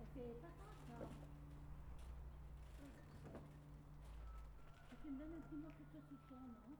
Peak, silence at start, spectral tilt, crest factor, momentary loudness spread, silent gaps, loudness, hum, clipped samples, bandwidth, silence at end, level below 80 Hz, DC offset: -42 dBFS; 0 s; -7.5 dB/octave; 14 dB; 7 LU; none; -58 LUFS; none; under 0.1%; over 20 kHz; 0 s; -60 dBFS; under 0.1%